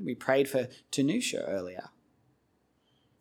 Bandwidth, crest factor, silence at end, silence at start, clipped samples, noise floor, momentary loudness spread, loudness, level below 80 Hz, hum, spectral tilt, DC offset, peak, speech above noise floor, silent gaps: 17.5 kHz; 22 dB; 1.3 s; 0 s; under 0.1%; -72 dBFS; 11 LU; -30 LUFS; -76 dBFS; none; -4.5 dB/octave; under 0.1%; -12 dBFS; 42 dB; none